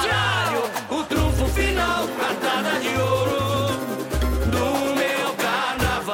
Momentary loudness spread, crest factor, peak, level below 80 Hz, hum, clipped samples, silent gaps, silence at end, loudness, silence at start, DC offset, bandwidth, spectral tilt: 4 LU; 12 dB; -10 dBFS; -30 dBFS; none; under 0.1%; none; 0 s; -22 LUFS; 0 s; under 0.1%; 16.5 kHz; -4.5 dB/octave